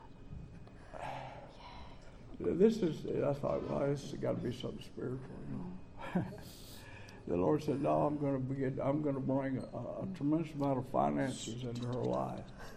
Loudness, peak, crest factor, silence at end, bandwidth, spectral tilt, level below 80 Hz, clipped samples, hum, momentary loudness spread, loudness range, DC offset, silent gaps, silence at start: -36 LUFS; -14 dBFS; 22 dB; 0 s; 15.5 kHz; -7.5 dB/octave; -56 dBFS; under 0.1%; none; 19 LU; 5 LU; under 0.1%; none; 0 s